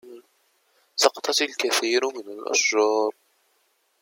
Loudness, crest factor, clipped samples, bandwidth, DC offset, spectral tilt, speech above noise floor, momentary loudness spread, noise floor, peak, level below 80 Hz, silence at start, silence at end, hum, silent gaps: -22 LUFS; 24 dB; under 0.1%; 16.5 kHz; under 0.1%; 0.5 dB/octave; 45 dB; 9 LU; -68 dBFS; -2 dBFS; -84 dBFS; 0.05 s; 0.9 s; none; none